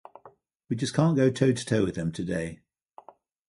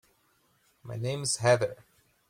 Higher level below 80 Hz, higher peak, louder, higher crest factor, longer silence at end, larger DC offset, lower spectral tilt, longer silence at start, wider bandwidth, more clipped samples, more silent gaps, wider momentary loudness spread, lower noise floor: first, -56 dBFS vs -66 dBFS; first, -8 dBFS vs -12 dBFS; about the same, -26 LUFS vs -28 LUFS; about the same, 20 dB vs 20 dB; first, 0.95 s vs 0.55 s; neither; first, -6.5 dB/octave vs -4 dB/octave; second, 0.25 s vs 0.85 s; second, 11.5 kHz vs 16 kHz; neither; first, 0.55-0.60 s vs none; about the same, 10 LU vs 11 LU; second, -56 dBFS vs -69 dBFS